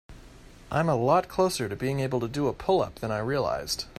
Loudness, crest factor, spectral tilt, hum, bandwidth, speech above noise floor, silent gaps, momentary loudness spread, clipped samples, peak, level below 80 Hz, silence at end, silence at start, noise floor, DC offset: -27 LUFS; 18 dB; -5.5 dB/octave; none; 14.5 kHz; 22 dB; none; 7 LU; under 0.1%; -10 dBFS; -50 dBFS; 0.05 s; 0.1 s; -49 dBFS; under 0.1%